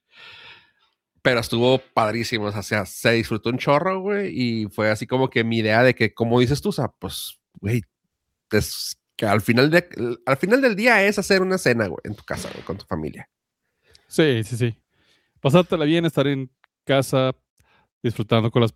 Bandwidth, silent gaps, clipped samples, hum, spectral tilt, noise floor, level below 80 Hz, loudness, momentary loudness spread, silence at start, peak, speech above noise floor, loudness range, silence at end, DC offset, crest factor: 16 kHz; 17.50-17.57 s, 17.92-18.01 s; under 0.1%; none; -5.5 dB/octave; -78 dBFS; -54 dBFS; -21 LUFS; 13 LU; 0.2 s; -2 dBFS; 57 dB; 6 LU; 0.05 s; under 0.1%; 20 dB